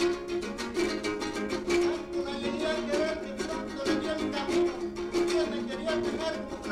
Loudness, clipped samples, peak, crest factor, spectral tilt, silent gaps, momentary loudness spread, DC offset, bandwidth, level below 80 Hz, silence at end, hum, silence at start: -31 LUFS; under 0.1%; -16 dBFS; 14 dB; -4 dB/octave; none; 6 LU; under 0.1%; 13 kHz; -52 dBFS; 0 s; none; 0 s